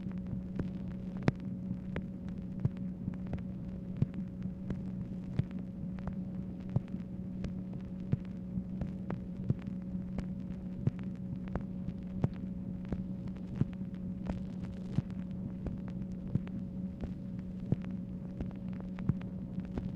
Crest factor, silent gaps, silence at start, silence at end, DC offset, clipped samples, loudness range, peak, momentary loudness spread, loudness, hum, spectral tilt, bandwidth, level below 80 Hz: 26 dB; none; 0 s; 0 s; under 0.1%; under 0.1%; 1 LU; -12 dBFS; 5 LU; -39 LUFS; none; -10 dB/octave; 6.6 kHz; -50 dBFS